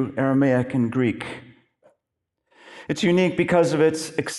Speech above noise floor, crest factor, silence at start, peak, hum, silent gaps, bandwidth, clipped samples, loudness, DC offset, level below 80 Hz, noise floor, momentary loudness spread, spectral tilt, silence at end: 60 dB; 16 dB; 0 s; -6 dBFS; none; none; 12 kHz; under 0.1%; -21 LUFS; under 0.1%; -60 dBFS; -81 dBFS; 14 LU; -6 dB/octave; 0 s